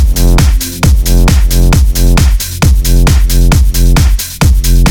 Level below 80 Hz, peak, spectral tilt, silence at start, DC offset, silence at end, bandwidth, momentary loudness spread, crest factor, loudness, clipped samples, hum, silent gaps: -8 dBFS; 0 dBFS; -5 dB/octave; 0 s; under 0.1%; 0 s; 18.5 kHz; 2 LU; 6 dB; -9 LUFS; under 0.1%; none; none